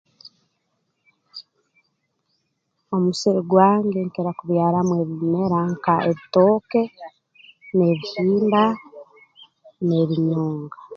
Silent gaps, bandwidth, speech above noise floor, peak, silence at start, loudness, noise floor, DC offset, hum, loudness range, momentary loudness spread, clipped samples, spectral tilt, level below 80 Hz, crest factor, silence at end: none; 7.8 kHz; 53 dB; -2 dBFS; 1.35 s; -20 LUFS; -73 dBFS; under 0.1%; none; 3 LU; 14 LU; under 0.1%; -7.5 dB/octave; -64 dBFS; 20 dB; 0 s